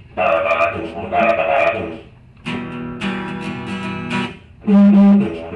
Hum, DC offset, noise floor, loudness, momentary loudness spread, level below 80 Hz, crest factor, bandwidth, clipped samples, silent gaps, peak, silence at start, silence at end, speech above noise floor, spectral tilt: none; under 0.1%; -40 dBFS; -17 LUFS; 16 LU; -48 dBFS; 12 dB; 9 kHz; under 0.1%; none; -4 dBFS; 0 s; 0 s; 28 dB; -8 dB/octave